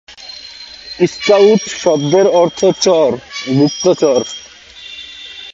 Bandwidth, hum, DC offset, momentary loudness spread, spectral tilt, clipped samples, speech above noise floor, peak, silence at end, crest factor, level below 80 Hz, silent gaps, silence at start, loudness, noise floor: 7.8 kHz; none; under 0.1%; 20 LU; -5 dB/octave; under 0.1%; 23 dB; 0 dBFS; 0 s; 14 dB; -54 dBFS; none; 0.1 s; -12 LUFS; -35 dBFS